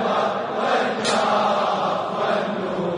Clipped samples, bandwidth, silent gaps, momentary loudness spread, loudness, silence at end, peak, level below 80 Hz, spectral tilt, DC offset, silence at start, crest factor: under 0.1%; 11 kHz; none; 4 LU; -21 LUFS; 0 s; -8 dBFS; -66 dBFS; -4 dB/octave; under 0.1%; 0 s; 14 dB